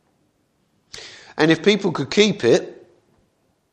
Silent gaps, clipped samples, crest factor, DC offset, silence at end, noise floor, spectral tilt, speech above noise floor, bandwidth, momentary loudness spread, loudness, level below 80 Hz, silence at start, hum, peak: none; under 0.1%; 22 dB; under 0.1%; 1 s; -65 dBFS; -4.5 dB/octave; 48 dB; 9.4 kHz; 22 LU; -18 LUFS; -60 dBFS; 0.95 s; none; 0 dBFS